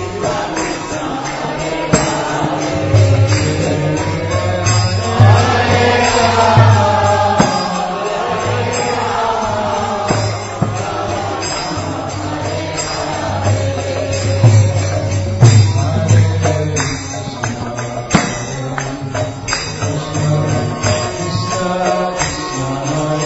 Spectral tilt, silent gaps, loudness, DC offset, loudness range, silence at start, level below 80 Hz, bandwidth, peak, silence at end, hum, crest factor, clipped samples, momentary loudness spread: -5 dB/octave; none; -15 LUFS; under 0.1%; 7 LU; 0 s; -36 dBFS; 8 kHz; 0 dBFS; 0 s; none; 14 dB; under 0.1%; 10 LU